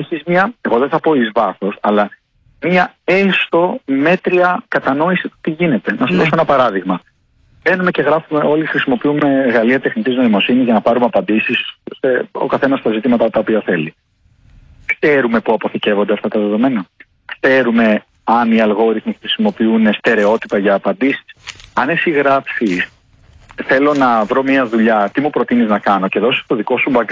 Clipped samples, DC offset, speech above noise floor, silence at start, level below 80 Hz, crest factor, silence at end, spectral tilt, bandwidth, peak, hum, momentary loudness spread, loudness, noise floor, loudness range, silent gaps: under 0.1%; under 0.1%; 39 dB; 0 s; -54 dBFS; 12 dB; 0 s; -7 dB/octave; 7.6 kHz; -2 dBFS; none; 6 LU; -14 LUFS; -53 dBFS; 3 LU; none